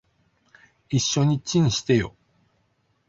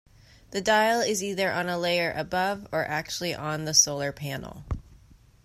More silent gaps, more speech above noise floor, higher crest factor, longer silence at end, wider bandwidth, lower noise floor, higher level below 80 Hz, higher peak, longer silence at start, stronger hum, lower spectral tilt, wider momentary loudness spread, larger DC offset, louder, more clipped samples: neither; first, 47 dB vs 28 dB; about the same, 18 dB vs 20 dB; first, 1 s vs 0.5 s; second, 7.8 kHz vs 16 kHz; first, -68 dBFS vs -55 dBFS; about the same, -52 dBFS vs -50 dBFS; about the same, -8 dBFS vs -6 dBFS; first, 0.9 s vs 0.5 s; neither; first, -5 dB/octave vs -2.5 dB/octave; second, 5 LU vs 16 LU; neither; first, -23 LUFS vs -26 LUFS; neither